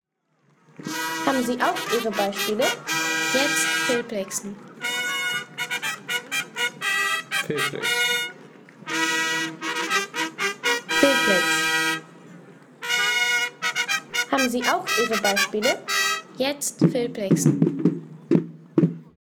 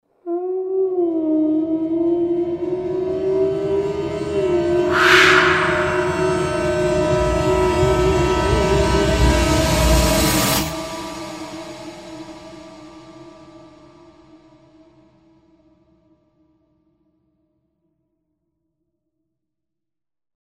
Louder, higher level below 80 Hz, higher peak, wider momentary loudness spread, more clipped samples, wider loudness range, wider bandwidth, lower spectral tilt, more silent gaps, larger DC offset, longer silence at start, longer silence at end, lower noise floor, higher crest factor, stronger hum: second, -23 LUFS vs -18 LUFS; second, -66 dBFS vs -30 dBFS; second, -4 dBFS vs 0 dBFS; second, 8 LU vs 17 LU; neither; second, 3 LU vs 16 LU; first, over 20 kHz vs 16 kHz; second, -3 dB/octave vs -4.5 dB/octave; neither; neither; first, 0.8 s vs 0.25 s; second, 0.2 s vs 6.8 s; second, -66 dBFS vs -89 dBFS; about the same, 20 dB vs 20 dB; neither